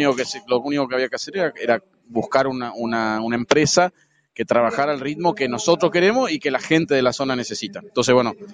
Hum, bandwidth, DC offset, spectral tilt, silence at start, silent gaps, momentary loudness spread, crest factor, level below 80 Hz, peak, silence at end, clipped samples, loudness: none; 10 kHz; under 0.1%; -4 dB/octave; 0 s; none; 8 LU; 20 dB; -58 dBFS; 0 dBFS; 0 s; under 0.1%; -20 LUFS